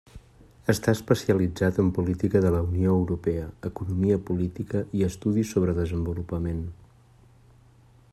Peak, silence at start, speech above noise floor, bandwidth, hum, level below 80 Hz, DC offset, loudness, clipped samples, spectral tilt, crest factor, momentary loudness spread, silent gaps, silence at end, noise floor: -6 dBFS; 0.15 s; 31 dB; 13.5 kHz; none; -48 dBFS; under 0.1%; -26 LUFS; under 0.1%; -7.5 dB/octave; 20 dB; 8 LU; none; 1.4 s; -55 dBFS